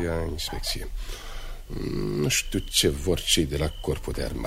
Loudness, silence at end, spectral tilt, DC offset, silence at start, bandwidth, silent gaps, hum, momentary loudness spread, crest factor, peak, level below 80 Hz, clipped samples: -26 LUFS; 0 s; -3.5 dB/octave; under 0.1%; 0 s; 16 kHz; none; none; 16 LU; 20 dB; -8 dBFS; -34 dBFS; under 0.1%